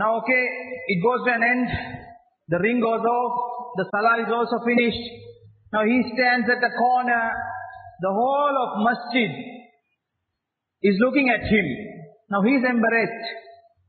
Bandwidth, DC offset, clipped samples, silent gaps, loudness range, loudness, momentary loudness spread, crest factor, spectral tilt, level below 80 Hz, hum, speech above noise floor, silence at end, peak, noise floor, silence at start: 4.6 kHz; under 0.1%; under 0.1%; none; 3 LU; -22 LUFS; 13 LU; 16 dB; -10.5 dB/octave; -52 dBFS; none; 61 dB; 0.35 s; -6 dBFS; -82 dBFS; 0 s